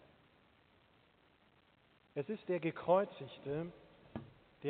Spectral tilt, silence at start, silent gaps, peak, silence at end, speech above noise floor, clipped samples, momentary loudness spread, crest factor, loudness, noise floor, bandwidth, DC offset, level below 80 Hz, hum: -6 dB/octave; 2.15 s; none; -18 dBFS; 0 s; 33 dB; under 0.1%; 18 LU; 24 dB; -39 LUFS; -70 dBFS; 4.5 kHz; under 0.1%; -74 dBFS; none